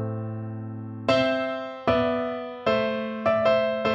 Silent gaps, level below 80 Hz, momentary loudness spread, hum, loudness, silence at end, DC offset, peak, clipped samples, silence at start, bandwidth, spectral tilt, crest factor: none; -54 dBFS; 12 LU; none; -25 LUFS; 0 s; under 0.1%; -8 dBFS; under 0.1%; 0 s; 8 kHz; -7 dB/octave; 16 dB